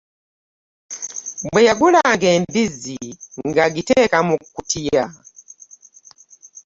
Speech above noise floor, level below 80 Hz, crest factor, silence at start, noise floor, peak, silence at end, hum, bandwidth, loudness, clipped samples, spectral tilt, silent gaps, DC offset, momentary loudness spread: 31 dB; -52 dBFS; 16 dB; 0.9 s; -48 dBFS; -2 dBFS; 0.05 s; none; 8 kHz; -17 LUFS; under 0.1%; -4 dB/octave; none; under 0.1%; 16 LU